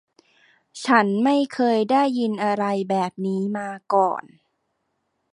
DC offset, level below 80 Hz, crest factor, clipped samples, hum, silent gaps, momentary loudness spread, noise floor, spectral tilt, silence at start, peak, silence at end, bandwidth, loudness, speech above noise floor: under 0.1%; -74 dBFS; 20 dB; under 0.1%; none; none; 8 LU; -74 dBFS; -6 dB/octave; 0.75 s; -2 dBFS; 1.1 s; 11 kHz; -21 LUFS; 53 dB